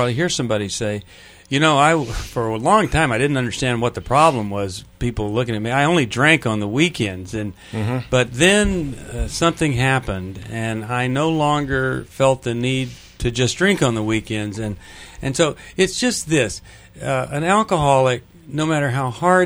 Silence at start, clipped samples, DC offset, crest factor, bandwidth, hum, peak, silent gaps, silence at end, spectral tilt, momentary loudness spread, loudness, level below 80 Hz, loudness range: 0 s; under 0.1%; under 0.1%; 20 dB; over 20 kHz; none; 0 dBFS; none; 0 s; -5 dB/octave; 12 LU; -19 LUFS; -38 dBFS; 3 LU